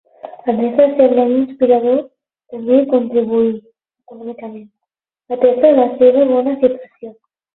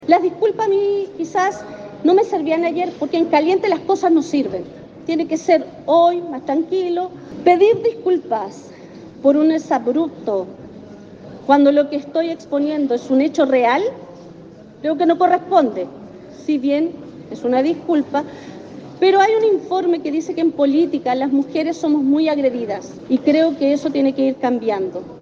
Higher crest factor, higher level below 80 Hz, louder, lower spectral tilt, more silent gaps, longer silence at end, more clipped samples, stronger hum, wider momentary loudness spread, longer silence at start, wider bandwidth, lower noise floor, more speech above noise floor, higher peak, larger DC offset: about the same, 14 dB vs 18 dB; about the same, -60 dBFS vs -62 dBFS; first, -14 LUFS vs -18 LUFS; first, -10.5 dB/octave vs -5.5 dB/octave; neither; first, 0.45 s vs 0 s; neither; neither; first, 21 LU vs 16 LU; first, 0.25 s vs 0 s; second, 4.1 kHz vs 7.4 kHz; first, -80 dBFS vs -40 dBFS; first, 67 dB vs 23 dB; about the same, 0 dBFS vs 0 dBFS; neither